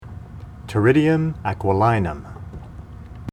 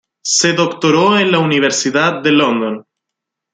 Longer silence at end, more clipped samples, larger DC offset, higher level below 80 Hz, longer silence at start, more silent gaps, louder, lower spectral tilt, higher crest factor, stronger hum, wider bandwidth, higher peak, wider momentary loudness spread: second, 0 s vs 0.75 s; neither; neither; first, -42 dBFS vs -60 dBFS; second, 0 s vs 0.25 s; neither; second, -19 LUFS vs -13 LUFS; first, -8.5 dB/octave vs -3.5 dB/octave; about the same, 18 dB vs 14 dB; neither; first, 12 kHz vs 9.6 kHz; second, -4 dBFS vs 0 dBFS; first, 22 LU vs 5 LU